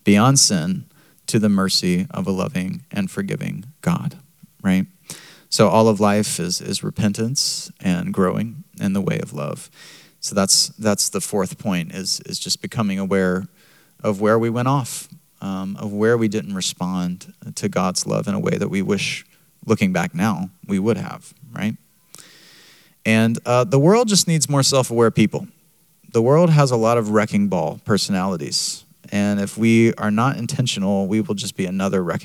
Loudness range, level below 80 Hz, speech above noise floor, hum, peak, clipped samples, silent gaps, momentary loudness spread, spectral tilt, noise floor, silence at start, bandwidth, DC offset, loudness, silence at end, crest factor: 6 LU; -64 dBFS; 39 dB; none; 0 dBFS; under 0.1%; none; 13 LU; -4.5 dB/octave; -58 dBFS; 0.05 s; 16.5 kHz; under 0.1%; -19 LUFS; 0 s; 20 dB